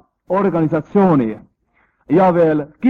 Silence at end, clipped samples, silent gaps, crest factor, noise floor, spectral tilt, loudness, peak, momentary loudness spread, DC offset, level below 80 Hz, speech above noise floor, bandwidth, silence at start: 0 s; under 0.1%; none; 14 dB; -61 dBFS; -10.5 dB/octave; -16 LUFS; -2 dBFS; 8 LU; under 0.1%; -52 dBFS; 47 dB; 4.7 kHz; 0.3 s